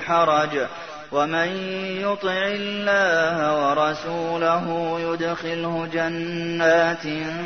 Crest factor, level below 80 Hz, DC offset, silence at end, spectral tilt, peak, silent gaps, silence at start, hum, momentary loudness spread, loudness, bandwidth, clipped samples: 16 dB; -60 dBFS; 0.2%; 0 s; -5 dB/octave; -6 dBFS; none; 0 s; none; 9 LU; -22 LUFS; 6.6 kHz; under 0.1%